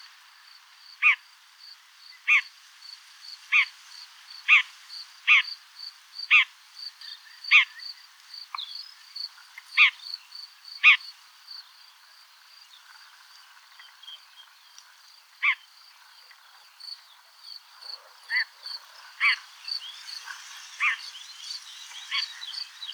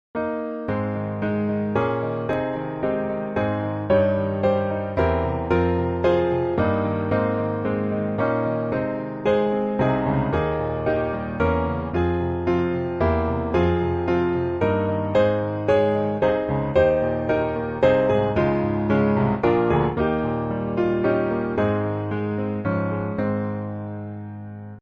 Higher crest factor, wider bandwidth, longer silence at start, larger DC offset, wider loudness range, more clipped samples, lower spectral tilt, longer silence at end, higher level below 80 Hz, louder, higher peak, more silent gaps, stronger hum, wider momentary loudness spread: first, 24 dB vs 16 dB; first, over 20 kHz vs 7.2 kHz; first, 1 s vs 0.15 s; neither; first, 11 LU vs 3 LU; neither; second, 9.5 dB/octave vs -9.5 dB/octave; about the same, 0 s vs 0 s; second, under -90 dBFS vs -40 dBFS; about the same, -23 LUFS vs -23 LUFS; about the same, -6 dBFS vs -6 dBFS; neither; neither; first, 25 LU vs 7 LU